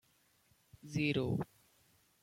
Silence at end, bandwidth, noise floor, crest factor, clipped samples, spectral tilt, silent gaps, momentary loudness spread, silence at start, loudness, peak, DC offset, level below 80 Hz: 0.8 s; 16.5 kHz; -72 dBFS; 18 dB; under 0.1%; -6.5 dB/octave; none; 15 LU; 0.85 s; -37 LUFS; -22 dBFS; under 0.1%; -68 dBFS